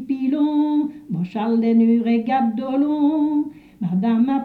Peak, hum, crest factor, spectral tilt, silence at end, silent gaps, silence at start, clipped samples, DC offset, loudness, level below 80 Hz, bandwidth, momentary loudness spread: -8 dBFS; none; 10 dB; -9.5 dB/octave; 0 s; none; 0 s; under 0.1%; under 0.1%; -20 LUFS; -62 dBFS; 4.6 kHz; 10 LU